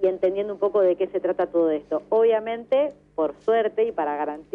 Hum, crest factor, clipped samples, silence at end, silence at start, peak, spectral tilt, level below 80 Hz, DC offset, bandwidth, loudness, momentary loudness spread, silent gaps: 50 Hz at -55 dBFS; 10 dB; under 0.1%; 0.15 s; 0 s; -12 dBFS; -7.5 dB/octave; -64 dBFS; under 0.1%; 4.5 kHz; -23 LUFS; 7 LU; none